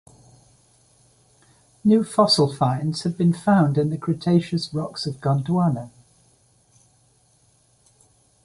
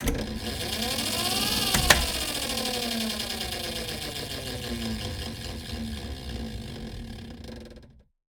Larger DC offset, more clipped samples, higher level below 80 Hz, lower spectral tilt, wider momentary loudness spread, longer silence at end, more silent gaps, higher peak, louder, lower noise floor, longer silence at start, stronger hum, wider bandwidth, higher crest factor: neither; neither; second, -60 dBFS vs -40 dBFS; first, -6.5 dB/octave vs -2.5 dB/octave; second, 9 LU vs 17 LU; first, 2.55 s vs 0.35 s; neither; second, -4 dBFS vs 0 dBFS; first, -21 LUFS vs -28 LUFS; first, -60 dBFS vs -52 dBFS; first, 1.85 s vs 0 s; neither; second, 11.5 kHz vs 19.5 kHz; second, 18 dB vs 30 dB